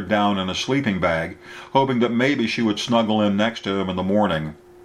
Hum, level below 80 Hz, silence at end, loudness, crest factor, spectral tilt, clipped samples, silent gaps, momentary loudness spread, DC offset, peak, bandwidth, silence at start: none; -52 dBFS; 0.3 s; -21 LUFS; 18 dB; -5.5 dB/octave; under 0.1%; none; 6 LU; under 0.1%; -2 dBFS; 12 kHz; 0 s